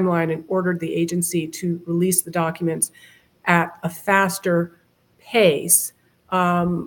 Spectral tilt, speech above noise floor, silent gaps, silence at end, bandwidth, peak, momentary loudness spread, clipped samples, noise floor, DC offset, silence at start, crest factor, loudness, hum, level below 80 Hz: -4 dB/octave; 37 dB; none; 0 s; 17.5 kHz; 0 dBFS; 9 LU; under 0.1%; -57 dBFS; under 0.1%; 0 s; 22 dB; -20 LUFS; none; -60 dBFS